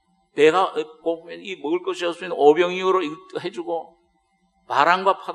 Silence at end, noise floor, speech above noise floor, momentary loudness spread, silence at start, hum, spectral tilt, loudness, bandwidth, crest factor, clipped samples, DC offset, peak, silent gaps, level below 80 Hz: 0 s; -66 dBFS; 45 dB; 14 LU; 0.35 s; none; -4.5 dB/octave; -21 LUFS; 10.5 kHz; 20 dB; under 0.1%; under 0.1%; 0 dBFS; none; -72 dBFS